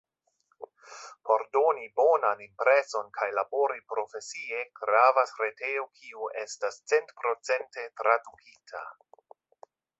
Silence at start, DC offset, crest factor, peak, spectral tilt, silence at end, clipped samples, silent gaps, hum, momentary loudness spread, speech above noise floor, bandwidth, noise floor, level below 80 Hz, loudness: 0.6 s; under 0.1%; 22 dB; -6 dBFS; -1 dB/octave; 1.1 s; under 0.1%; none; none; 18 LU; 45 dB; 8.2 kHz; -73 dBFS; -84 dBFS; -28 LUFS